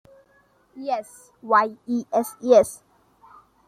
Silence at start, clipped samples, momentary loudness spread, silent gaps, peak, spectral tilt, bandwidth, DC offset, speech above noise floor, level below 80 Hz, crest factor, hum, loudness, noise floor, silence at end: 0.75 s; under 0.1%; 17 LU; none; -4 dBFS; -4.5 dB/octave; 15.5 kHz; under 0.1%; 39 dB; -64 dBFS; 20 dB; none; -22 LUFS; -61 dBFS; 0.95 s